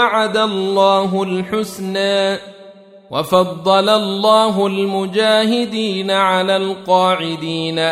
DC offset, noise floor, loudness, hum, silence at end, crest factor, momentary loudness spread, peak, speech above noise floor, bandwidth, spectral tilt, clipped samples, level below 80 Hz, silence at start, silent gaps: under 0.1%; -41 dBFS; -16 LUFS; none; 0 s; 14 dB; 8 LU; -2 dBFS; 25 dB; 15.5 kHz; -5 dB/octave; under 0.1%; -58 dBFS; 0 s; none